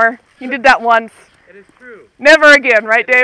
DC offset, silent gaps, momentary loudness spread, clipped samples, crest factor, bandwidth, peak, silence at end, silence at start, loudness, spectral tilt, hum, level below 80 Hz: under 0.1%; none; 10 LU; 0.7%; 12 dB; 11 kHz; 0 dBFS; 0 s; 0 s; -9 LUFS; -1.5 dB/octave; none; -50 dBFS